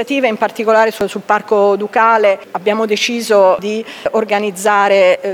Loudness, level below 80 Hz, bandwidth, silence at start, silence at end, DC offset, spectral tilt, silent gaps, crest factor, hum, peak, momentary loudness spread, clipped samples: -13 LUFS; -60 dBFS; 17 kHz; 0 s; 0 s; under 0.1%; -3.5 dB/octave; none; 12 dB; none; 0 dBFS; 7 LU; under 0.1%